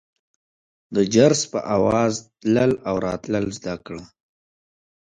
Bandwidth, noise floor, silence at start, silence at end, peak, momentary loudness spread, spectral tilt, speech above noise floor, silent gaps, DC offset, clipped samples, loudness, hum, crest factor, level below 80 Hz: 9.6 kHz; under -90 dBFS; 0.9 s; 1 s; -2 dBFS; 15 LU; -5 dB/octave; over 70 dB; none; under 0.1%; under 0.1%; -21 LUFS; none; 20 dB; -52 dBFS